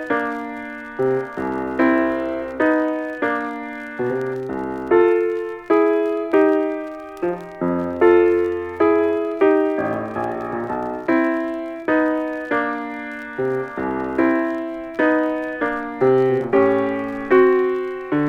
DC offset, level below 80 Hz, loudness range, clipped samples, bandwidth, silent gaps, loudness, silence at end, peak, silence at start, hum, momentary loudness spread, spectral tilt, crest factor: under 0.1%; -54 dBFS; 4 LU; under 0.1%; 6.6 kHz; none; -20 LUFS; 0 s; -4 dBFS; 0 s; none; 10 LU; -8 dB/octave; 16 dB